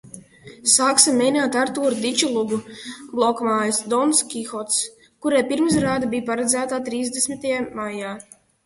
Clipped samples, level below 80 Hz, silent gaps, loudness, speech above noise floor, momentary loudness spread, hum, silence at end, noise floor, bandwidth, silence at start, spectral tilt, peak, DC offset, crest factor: under 0.1%; -58 dBFS; none; -20 LUFS; 23 dB; 13 LU; none; 0.45 s; -44 dBFS; 12 kHz; 0.05 s; -2.5 dB/octave; 0 dBFS; under 0.1%; 22 dB